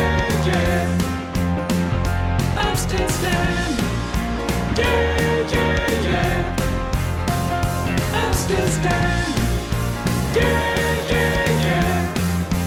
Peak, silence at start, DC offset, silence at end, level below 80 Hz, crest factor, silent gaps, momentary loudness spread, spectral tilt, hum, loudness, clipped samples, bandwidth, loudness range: -6 dBFS; 0 s; under 0.1%; 0 s; -28 dBFS; 14 dB; none; 4 LU; -5 dB/octave; none; -20 LUFS; under 0.1%; 18 kHz; 1 LU